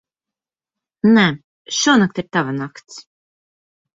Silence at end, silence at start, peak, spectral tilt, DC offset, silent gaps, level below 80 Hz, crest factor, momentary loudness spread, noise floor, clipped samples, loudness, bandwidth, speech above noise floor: 0.95 s; 1.05 s; -2 dBFS; -4 dB/octave; under 0.1%; 1.44-1.65 s; -60 dBFS; 18 dB; 18 LU; -88 dBFS; under 0.1%; -16 LUFS; 7.8 kHz; 72 dB